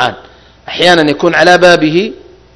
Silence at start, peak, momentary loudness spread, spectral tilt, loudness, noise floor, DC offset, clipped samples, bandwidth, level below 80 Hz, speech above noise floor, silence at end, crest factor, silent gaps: 0 s; 0 dBFS; 12 LU; -4.5 dB/octave; -8 LUFS; -38 dBFS; under 0.1%; 3%; 11 kHz; -44 dBFS; 30 dB; 0.35 s; 10 dB; none